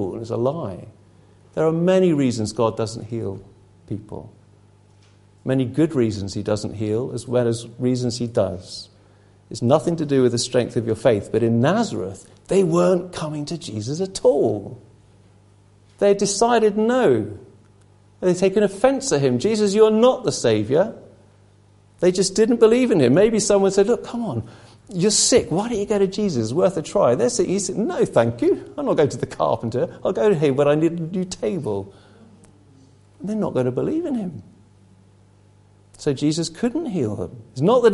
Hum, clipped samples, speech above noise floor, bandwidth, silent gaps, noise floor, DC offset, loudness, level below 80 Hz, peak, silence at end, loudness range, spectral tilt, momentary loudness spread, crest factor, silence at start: 50 Hz at -50 dBFS; under 0.1%; 33 dB; 11.5 kHz; none; -53 dBFS; under 0.1%; -20 LUFS; -52 dBFS; -2 dBFS; 0 s; 8 LU; -5.5 dB/octave; 13 LU; 20 dB; 0 s